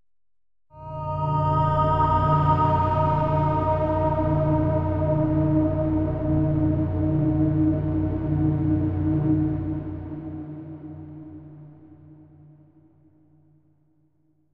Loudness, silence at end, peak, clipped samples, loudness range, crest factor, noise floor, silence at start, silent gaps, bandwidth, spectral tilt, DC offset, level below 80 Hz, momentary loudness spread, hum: -23 LUFS; 2.3 s; -8 dBFS; under 0.1%; 13 LU; 14 dB; -84 dBFS; 0.75 s; none; 5.2 kHz; -11 dB/octave; under 0.1%; -40 dBFS; 17 LU; none